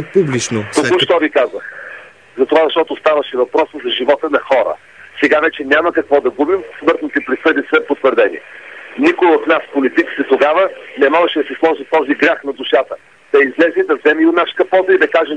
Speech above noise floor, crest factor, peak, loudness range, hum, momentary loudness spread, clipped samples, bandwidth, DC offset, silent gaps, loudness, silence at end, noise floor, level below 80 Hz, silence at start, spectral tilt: 22 dB; 14 dB; 0 dBFS; 2 LU; none; 8 LU; under 0.1%; 10.5 kHz; 0.2%; none; -14 LUFS; 0 s; -35 dBFS; -60 dBFS; 0 s; -4.5 dB/octave